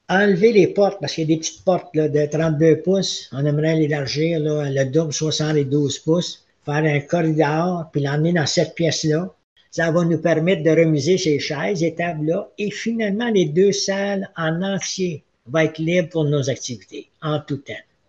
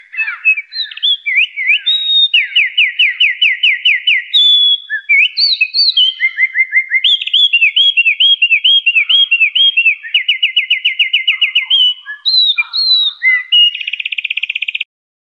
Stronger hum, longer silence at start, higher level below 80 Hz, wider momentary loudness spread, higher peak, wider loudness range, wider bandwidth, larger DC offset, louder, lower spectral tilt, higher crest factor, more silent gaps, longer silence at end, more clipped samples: neither; about the same, 0.1 s vs 0.15 s; first, -58 dBFS vs -86 dBFS; about the same, 9 LU vs 8 LU; about the same, -2 dBFS vs -2 dBFS; about the same, 2 LU vs 2 LU; about the same, 8 kHz vs 8.6 kHz; neither; second, -20 LUFS vs -9 LUFS; first, -5.5 dB/octave vs 7 dB/octave; first, 18 dB vs 10 dB; first, 9.44-9.56 s vs none; about the same, 0.3 s vs 0.4 s; neither